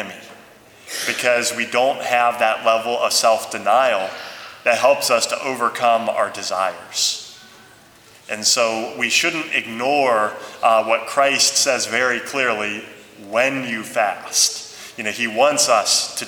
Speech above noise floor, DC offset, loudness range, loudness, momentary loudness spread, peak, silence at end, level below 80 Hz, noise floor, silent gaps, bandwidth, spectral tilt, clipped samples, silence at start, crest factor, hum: 29 dB; under 0.1%; 3 LU; -18 LUFS; 10 LU; -2 dBFS; 0 s; -68 dBFS; -47 dBFS; none; over 20 kHz; -0.5 dB/octave; under 0.1%; 0 s; 18 dB; none